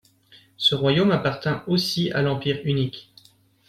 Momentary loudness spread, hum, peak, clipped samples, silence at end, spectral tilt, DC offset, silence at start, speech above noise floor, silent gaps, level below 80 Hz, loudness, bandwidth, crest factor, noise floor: 7 LU; none; -8 dBFS; under 0.1%; 0.65 s; -6 dB/octave; under 0.1%; 0.6 s; 35 dB; none; -56 dBFS; -22 LUFS; 15.5 kHz; 16 dB; -57 dBFS